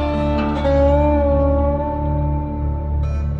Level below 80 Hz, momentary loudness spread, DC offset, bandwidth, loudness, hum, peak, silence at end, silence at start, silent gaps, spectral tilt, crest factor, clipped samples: -22 dBFS; 7 LU; under 0.1%; 5 kHz; -18 LUFS; none; -6 dBFS; 0 s; 0 s; none; -9.5 dB/octave; 12 dB; under 0.1%